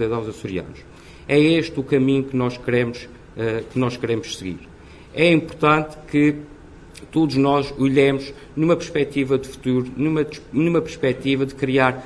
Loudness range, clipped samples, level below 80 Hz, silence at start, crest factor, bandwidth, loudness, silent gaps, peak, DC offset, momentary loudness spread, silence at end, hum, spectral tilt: 3 LU; under 0.1%; -48 dBFS; 0 s; 18 dB; 11 kHz; -20 LUFS; none; -2 dBFS; under 0.1%; 13 LU; 0 s; none; -6.5 dB/octave